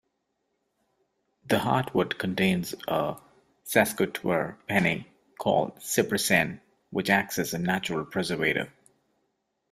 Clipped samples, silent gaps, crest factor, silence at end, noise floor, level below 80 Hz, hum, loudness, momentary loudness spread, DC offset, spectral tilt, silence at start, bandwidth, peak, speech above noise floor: under 0.1%; none; 22 dB; 1 s; -78 dBFS; -62 dBFS; none; -27 LUFS; 8 LU; under 0.1%; -4.5 dB/octave; 1.45 s; 16 kHz; -6 dBFS; 51 dB